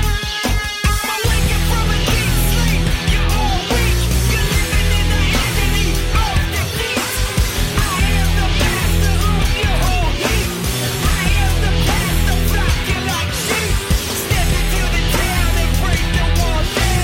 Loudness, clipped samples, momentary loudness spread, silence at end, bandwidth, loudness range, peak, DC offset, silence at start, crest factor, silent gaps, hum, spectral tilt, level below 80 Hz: -17 LUFS; under 0.1%; 2 LU; 0 s; 17 kHz; 1 LU; -4 dBFS; under 0.1%; 0 s; 12 dB; none; none; -4 dB/octave; -18 dBFS